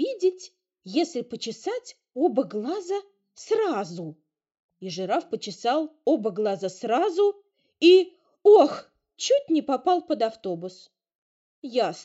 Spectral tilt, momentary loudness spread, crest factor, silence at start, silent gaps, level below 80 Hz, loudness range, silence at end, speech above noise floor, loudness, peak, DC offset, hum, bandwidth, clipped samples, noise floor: -3.5 dB/octave; 18 LU; 20 dB; 0 s; 4.59-4.69 s, 11.15-11.62 s; -80 dBFS; 8 LU; 0 s; 26 dB; -24 LUFS; -6 dBFS; under 0.1%; none; 8 kHz; under 0.1%; -49 dBFS